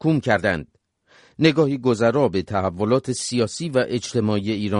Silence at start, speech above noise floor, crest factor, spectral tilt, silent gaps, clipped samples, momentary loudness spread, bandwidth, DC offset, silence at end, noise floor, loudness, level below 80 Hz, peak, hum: 0 s; 35 dB; 18 dB; -5.5 dB/octave; none; under 0.1%; 5 LU; 11 kHz; under 0.1%; 0 s; -56 dBFS; -21 LUFS; -54 dBFS; -4 dBFS; none